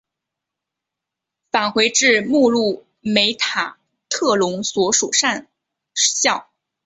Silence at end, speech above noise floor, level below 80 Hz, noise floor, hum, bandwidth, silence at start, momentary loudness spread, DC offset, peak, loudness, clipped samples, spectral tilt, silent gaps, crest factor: 0.45 s; 66 dB; -64 dBFS; -84 dBFS; none; 8.4 kHz; 1.55 s; 12 LU; under 0.1%; -2 dBFS; -17 LUFS; under 0.1%; -1.5 dB/octave; none; 18 dB